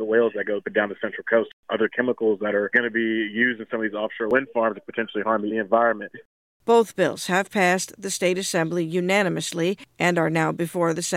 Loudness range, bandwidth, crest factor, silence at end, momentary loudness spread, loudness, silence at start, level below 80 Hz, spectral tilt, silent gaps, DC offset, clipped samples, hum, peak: 1 LU; 16 kHz; 18 dB; 0 s; 7 LU; -23 LUFS; 0 s; -70 dBFS; -4.5 dB/octave; 1.53-1.63 s, 6.25-6.60 s; under 0.1%; under 0.1%; none; -4 dBFS